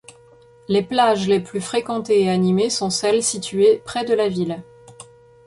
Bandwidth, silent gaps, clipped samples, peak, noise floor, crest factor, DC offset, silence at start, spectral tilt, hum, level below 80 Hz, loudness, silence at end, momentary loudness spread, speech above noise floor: 11.5 kHz; none; under 0.1%; -4 dBFS; -49 dBFS; 16 dB; under 0.1%; 0.7 s; -4.5 dB/octave; none; -58 dBFS; -19 LUFS; 0.45 s; 7 LU; 30 dB